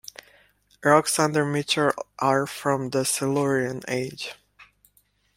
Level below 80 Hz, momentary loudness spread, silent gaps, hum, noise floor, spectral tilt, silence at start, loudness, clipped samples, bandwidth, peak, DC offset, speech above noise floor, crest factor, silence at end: -64 dBFS; 10 LU; none; 50 Hz at -55 dBFS; -65 dBFS; -4 dB/octave; 0.8 s; -23 LUFS; under 0.1%; 16.5 kHz; -2 dBFS; under 0.1%; 41 dB; 22 dB; 0.75 s